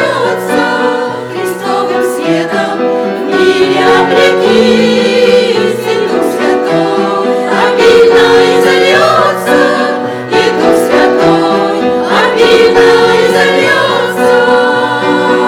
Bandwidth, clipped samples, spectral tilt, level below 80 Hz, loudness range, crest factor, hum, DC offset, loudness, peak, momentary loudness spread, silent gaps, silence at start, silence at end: 16.5 kHz; 1%; -4.5 dB/octave; -46 dBFS; 3 LU; 8 dB; none; under 0.1%; -8 LUFS; 0 dBFS; 7 LU; none; 0 s; 0 s